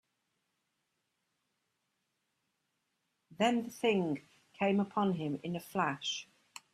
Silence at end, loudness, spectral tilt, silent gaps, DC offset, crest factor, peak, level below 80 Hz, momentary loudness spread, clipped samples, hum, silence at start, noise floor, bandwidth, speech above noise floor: 0.5 s; -34 LUFS; -5.5 dB/octave; none; under 0.1%; 20 dB; -16 dBFS; -78 dBFS; 10 LU; under 0.1%; none; 3.3 s; -83 dBFS; 15 kHz; 50 dB